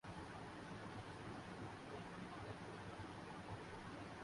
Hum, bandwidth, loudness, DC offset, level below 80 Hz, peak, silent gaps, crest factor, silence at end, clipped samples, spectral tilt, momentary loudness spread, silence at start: none; 11.5 kHz; -53 LUFS; under 0.1%; -68 dBFS; -38 dBFS; none; 14 dB; 0 s; under 0.1%; -5.5 dB/octave; 1 LU; 0.05 s